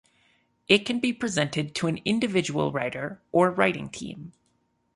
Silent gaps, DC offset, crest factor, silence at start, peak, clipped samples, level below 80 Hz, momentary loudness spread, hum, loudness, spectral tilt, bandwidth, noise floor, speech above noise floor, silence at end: none; under 0.1%; 22 dB; 0.7 s; -4 dBFS; under 0.1%; -62 dBFS; 13 LU; none; -25 LUFS; -4.5 dB/octave; 11.5 kHz; -71 dBFS; 45 dB; 0.65 s